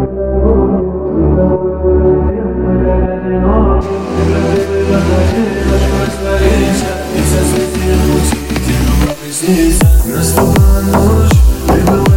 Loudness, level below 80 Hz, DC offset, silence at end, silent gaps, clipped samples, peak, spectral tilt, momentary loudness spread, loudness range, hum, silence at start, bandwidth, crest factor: -12 LUFS; -16 dBFS; under 0.1%; 0 s; none; under 0.1%; 0 dBFS; -6 dB/octave; 5 LU; 2 LU; none; 0 s; 17 kHz; 10 dB